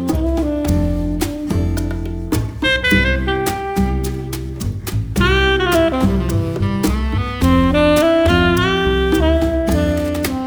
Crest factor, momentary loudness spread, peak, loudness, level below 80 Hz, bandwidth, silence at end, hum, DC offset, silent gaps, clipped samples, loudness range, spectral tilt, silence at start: 14 dB; 9 LU; -2 dBFS; -17 LUFS; -24 dBFS; over 20 kHz; 0 s; none; under 0.1%; none; under 0.1%; 3 LU; -6 dB/octave; 0 s